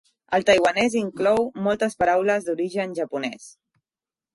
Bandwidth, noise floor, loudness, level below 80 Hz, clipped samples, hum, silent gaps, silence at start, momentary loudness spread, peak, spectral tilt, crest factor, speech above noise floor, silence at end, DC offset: 11.5 kHz; under -90 dBFS; -22 LUFS; -58 dBFS; under 0.1%; none; none; 0.3 s; 10 LU; -6 dBFS; -4.5 dB/octave; 18 dB; over 68 dB; 0.85 s; under 0.1%